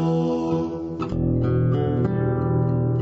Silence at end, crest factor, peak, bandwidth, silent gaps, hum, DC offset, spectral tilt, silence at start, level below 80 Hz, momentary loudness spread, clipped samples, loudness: 0 s; 10 dB; -12 dBFS; 6.4 kHz; none; none; under 0.1%; -10 dB/octave; 0 s; -38 dBFS; 5 LU; under 0.1%; -23 LUFS